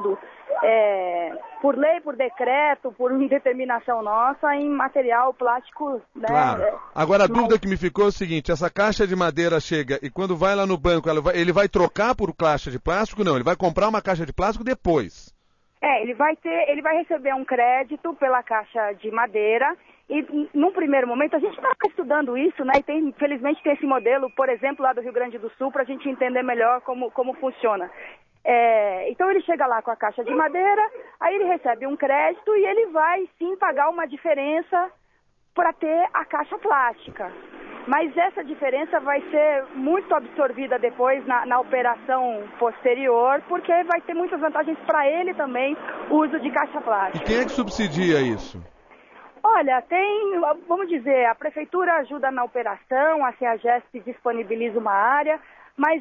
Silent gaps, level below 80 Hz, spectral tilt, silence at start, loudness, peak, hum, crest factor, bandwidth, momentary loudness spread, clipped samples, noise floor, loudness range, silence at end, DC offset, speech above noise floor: none; -48 dBFS; -6 dB/octave; 0 s; -22 LUFS; -6 dBFS; none; 16 dB; 7.4 kHz; 7 LU; under 0.1%; -64 dBFS; 2 LU; 0 s; under 0.1%; 42 dB